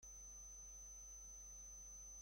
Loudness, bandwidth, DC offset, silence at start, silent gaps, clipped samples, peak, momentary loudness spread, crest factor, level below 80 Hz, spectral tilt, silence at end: -55 LUFS; 16.5 kHz; under 0.1%; 0 s; none; under 0.1%; -50 dBFS; 0 LU; 8 dB; -64 dBFS; -1.5 dB/octave; 0 s